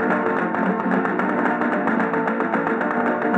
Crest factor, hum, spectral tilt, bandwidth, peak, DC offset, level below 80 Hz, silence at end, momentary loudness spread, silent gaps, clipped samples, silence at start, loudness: 16 dB; none; -8 dB/octave; 8.4 kHz; -4 dBFS; under 0.1%; -68 dBFS; 0 s; 1 LU; none; under 0.1%; 0 s; -21 LUFS